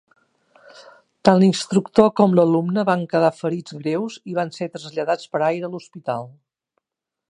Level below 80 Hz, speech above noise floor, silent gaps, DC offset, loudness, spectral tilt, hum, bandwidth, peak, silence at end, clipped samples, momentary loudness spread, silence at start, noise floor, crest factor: -62 dBFS; 66 dB; none; under 0.1%; -20 LUFS; -6.5 dB/octave; none; 10.5 kHz; 0 dBFS; 1 s; under 0.1%; 13 LU; 0.8 s; -86 dBFS; 20 dB